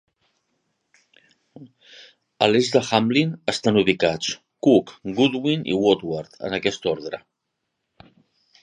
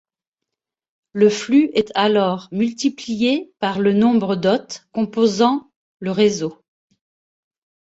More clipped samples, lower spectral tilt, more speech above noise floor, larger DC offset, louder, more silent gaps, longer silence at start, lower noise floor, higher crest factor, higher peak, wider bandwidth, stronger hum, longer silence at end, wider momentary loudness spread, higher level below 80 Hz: neither; about the same, -5 dB/octave vs -5.5 dB/octave; second, 57 dB vs 67 dB; neither; about the same, -21 LUFS vs -19 LUFS; second, none vs 5.76-5.98 s; first, 1.6 s vs 1.15 s; second, -78 dBFS vs -85 dBFS; first, 22 dB vs 16 dB; about the same, -2 dBFS vs -2 dBFS; first, 10.5 kHz vs 8 kHz; neither; first, 1.45 s vs 1.3 s; about the same, 11 LU vs 10 LU; about the same, -60 dBFS vs -62 dBFS